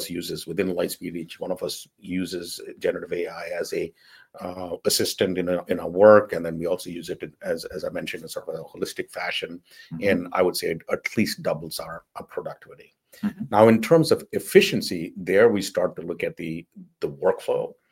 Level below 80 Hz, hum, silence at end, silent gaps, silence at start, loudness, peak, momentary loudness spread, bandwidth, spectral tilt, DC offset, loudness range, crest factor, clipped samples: -62 dBFS; none; 0.2 s; none; 0 s; -24 LUFS; 0 dBFS; 17 LU; 17 kHz; -4.5 dB/octave; under 0.1%; 10 LU; 24 dB; under 0.1%